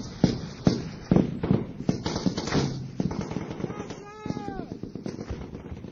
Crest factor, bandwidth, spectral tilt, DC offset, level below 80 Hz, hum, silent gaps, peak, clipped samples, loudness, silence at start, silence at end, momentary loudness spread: 22 dB; 7.6 kHz; -6.5 dB/octave; under 0.1%; -46 dBFS; none; none; -6 dBFS; under 0.1%; -29 LUFS; 0 s; 0 s; 13 LU